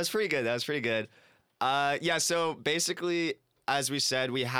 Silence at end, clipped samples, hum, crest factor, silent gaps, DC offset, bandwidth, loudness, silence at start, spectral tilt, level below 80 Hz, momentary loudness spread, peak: 0 s; under 0.1%; none; 18 dB; none; under 0.1%; over 20 kHz; -29 LUFS; 0 s; -2.5 dB/octave; -78 dBFS; 6 LU; -12 dBFS